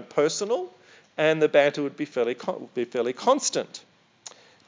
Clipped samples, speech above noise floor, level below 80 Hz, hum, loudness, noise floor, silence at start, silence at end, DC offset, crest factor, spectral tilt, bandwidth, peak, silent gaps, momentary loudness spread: under 0.1%; 24 dB; -84 dBFS; none; -25 LUFS; -48 dBFS; 0 s; 0.85 s; under 0.1%; 20 dB; -3.5 dB/octave; 7.8 kHz; -6 dBFS; none; 23 LU